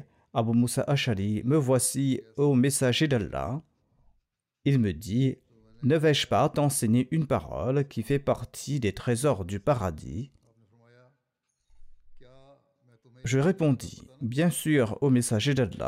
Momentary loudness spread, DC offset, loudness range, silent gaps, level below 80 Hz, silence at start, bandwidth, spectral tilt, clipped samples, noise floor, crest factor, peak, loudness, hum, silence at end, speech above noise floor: 10 LU; under 0.1%; 8 LU; none; -54 dBFS; 0.35 s; 16 kHz; -5.5 dB/octave; under 0.1%; -80 dBFS; 14 dB; -12 dBFS; -26 LUFS; none; 0 s; 54 dB